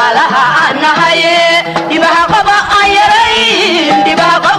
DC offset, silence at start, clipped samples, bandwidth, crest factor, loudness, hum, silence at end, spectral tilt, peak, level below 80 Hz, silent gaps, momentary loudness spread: under 0.1%; 0 s; under 0.1%; 13.5 kHz; 8 dB; -7 LUFS; none; 0 s; -3 dB/octave; 0 dBFS; -40 dBFS; none; 2 LU